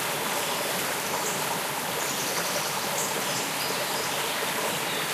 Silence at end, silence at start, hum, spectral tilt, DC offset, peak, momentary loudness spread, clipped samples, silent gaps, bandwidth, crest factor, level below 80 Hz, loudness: 0 s; 0 s; none; -1.5 dB/octave; under 0.1%; -14 dBFS; 1 LU; under 0.1%; none; 15.5 kHz; 14 dB; -70 dBFS; -27 LUFS